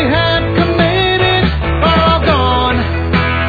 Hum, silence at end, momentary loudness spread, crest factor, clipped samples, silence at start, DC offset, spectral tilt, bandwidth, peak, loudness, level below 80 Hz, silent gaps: none; 0 s; 4 LU; 12 dB; under 0.1%; 0 s; under 0.1%; -8 dB/octave; 4.9 kHz; 0 dBFS; -12 LUFS; -22 dBFS; none